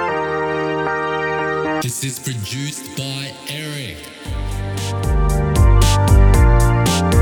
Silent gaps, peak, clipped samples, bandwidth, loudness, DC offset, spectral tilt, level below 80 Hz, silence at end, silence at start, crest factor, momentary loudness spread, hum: none; -2 dBFS; under 0.1%; 19 kHz; -18 LUFS; under 0.1%; -5 dB/octave; -20 dBFS; 0 s; 0 s; 14 dB; 13 LU; none